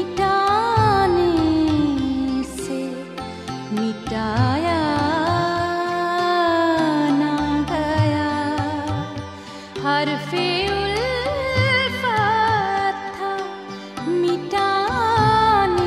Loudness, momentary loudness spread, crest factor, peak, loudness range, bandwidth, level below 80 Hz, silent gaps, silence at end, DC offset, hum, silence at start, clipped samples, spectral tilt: -20 LUFS; 11 LU; 16 dB; -4 dBFS; 3 LU; 14.5 kHz; -42 dBFS; none; 0 s; under 0.1%; none; 0 s; under 0.1%; -6 dB/octave